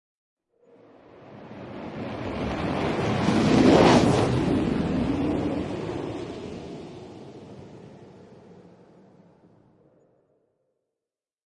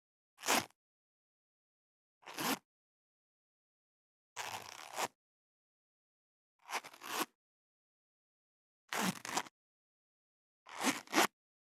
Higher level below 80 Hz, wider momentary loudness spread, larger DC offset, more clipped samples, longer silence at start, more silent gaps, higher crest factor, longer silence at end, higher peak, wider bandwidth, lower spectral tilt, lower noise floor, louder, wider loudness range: first, -46 dBFS vs under -90 dBFS; first, 26 LU vs 16 LU; neither; neither; first, 1.2 s vs 0.4 s; second, none vs 0.75-2.21 s, 2.65-4.36 s, 5.15-6.59 s, 7.35-8.88 s, 9.51-10.66 s; second, 22 dB vs 30 dB; first, 3.05 s vs 0.35 s; first, -4 dBFS vs -14 dBFS; second, 11.5 kHz vs 17.5 kHz; first, -6.5 dB/octave vs -2 dB/octave; about the same, -90 dBFS vs under -90 dBFS; first, -23 LUFS vs -38 LUFS; first, 19 LU vs 8 LU